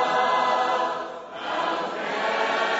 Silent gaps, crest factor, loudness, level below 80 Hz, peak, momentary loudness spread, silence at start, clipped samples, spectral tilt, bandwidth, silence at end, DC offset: none; 14 dB; -25 LUFS; -70 dBFS; -10 dBFS; 10 LU; 0 s; under 0.1%; 0 dB/octave; 8 kHz; 0 s; under 0.1%